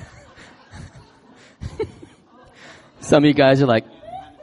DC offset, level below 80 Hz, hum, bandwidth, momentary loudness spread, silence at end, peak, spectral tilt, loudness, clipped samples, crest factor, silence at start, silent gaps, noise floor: under 0.1%; -50 dBFS; none; 11.5 kHz; 26 LU; 0.2 s; -2 dBFS; -6.5 dB/octave; -17 LUFS; under 0.1%; 20 dB; 0 s; none; -49 dBFS